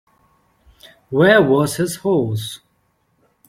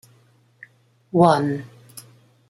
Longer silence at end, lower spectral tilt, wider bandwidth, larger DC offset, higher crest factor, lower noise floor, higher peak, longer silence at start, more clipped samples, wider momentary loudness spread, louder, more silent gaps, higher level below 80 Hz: first, 0.9 s vs 0.5 s; second, -5.5 dB/octave vs -7 dB/octave; about the same, 16.5 kHz vs 15 kHz; neither; about the same, 20 dB vs 22 dB; first, -64 dBFS vs -57 dBFS; about the same, 0 dBFS vs -2 dBFS; about the same, 1.1 s vs 1.15 s; neither; second, 15 LU vs 26 LU; first, -16 LUFS vs -19 LUFS; neither; first, -56 dBFS vs -64 dBFS